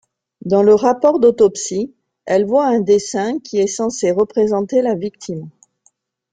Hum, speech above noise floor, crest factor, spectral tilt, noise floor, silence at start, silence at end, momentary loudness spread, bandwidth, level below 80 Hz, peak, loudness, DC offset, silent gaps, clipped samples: none; 45 dB; 14 dB; -5.5 dB/octave; -60 dBFS; 0.45 s; 0.85 s; 16 LU; 9.4 kHz; -58 dBFS; -2 dBFS; -16 LUFS; under 0.1%; none; under 0.1%